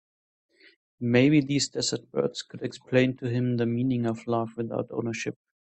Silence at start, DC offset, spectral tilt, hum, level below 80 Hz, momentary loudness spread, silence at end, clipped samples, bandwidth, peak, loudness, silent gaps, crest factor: 1 s; under 0.1%; -5.5 dB/octave; none; -66 dBFS; 12 LU; 0.45 s; under 0.1%; 8.8 kHz; -8 dBFS; -27 LUFS; none; 20 dB